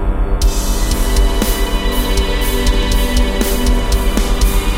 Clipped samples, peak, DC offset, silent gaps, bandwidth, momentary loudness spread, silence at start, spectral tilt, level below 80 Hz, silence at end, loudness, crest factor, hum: under 0.1%; -2 dBFS; under 0.1%; none; 16.5 kHz; 2 LU; 0 s; -4.5 dB/octave; -14 dBFS; 0 s; -16 LUFS; 12 dB; none